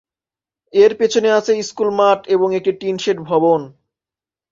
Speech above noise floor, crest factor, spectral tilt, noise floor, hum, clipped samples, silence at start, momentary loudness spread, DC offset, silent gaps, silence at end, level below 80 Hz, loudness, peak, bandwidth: over 75 dB; 16 dB; -4.5 dB/octave; under -90 dBFS; none; under 0.1%; 0.75 s; 7 LU; under 0.1%; none; 0.8 s; -62 dBFS; -16 LUFS; -2 dBFS; 7.6 kHz